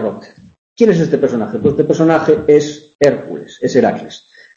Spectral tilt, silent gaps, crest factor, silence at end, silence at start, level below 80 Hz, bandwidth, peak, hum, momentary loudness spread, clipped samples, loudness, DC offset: -6.5 dB/octave; 0.58-0.76 s, 2.95-2.99 s; 14 dB; 0.4 s; 0 s; -50 dBFS; 7.6 kHz; 0 dBFS; none; 14 LU; under 0.1%; -14 LUFS; under 0.1%